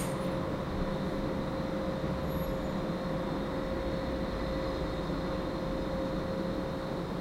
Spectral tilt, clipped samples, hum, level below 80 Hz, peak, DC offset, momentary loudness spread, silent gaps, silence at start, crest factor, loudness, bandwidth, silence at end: -7 dB/octave; under 0.1%; none; -42 dBFS; -20 dBFS; under 0.1%; 1 LU; none; 0 s; 14 dB; -34 LUFS; 16 kHz; 0 s